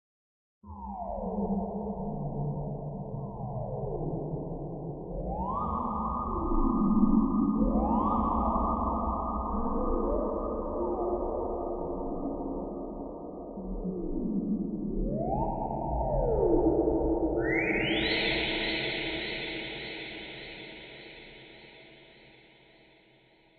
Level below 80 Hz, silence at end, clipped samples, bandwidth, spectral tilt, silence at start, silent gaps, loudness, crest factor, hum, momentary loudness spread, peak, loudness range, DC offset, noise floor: -40 dBFS; 1.3 s; under 0.1%; 4.7 kHz; -9.5 dB/octave; 0.65 s; none; -31 LUFS; 18 dB; none; 14 LU; -12 dBFS; 9 LU; under 0.1%; -62 dBFS